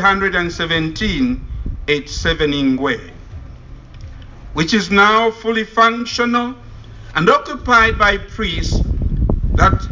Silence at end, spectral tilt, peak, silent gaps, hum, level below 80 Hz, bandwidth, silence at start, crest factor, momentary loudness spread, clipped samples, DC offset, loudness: 0 s; -5 dB/octave; 0 dBFS; none; none; -26 dBFS; 7.6 kHz; 0 s; 16 dB; 15 LU; under 0.1%; under 0.1%; -16 LUFS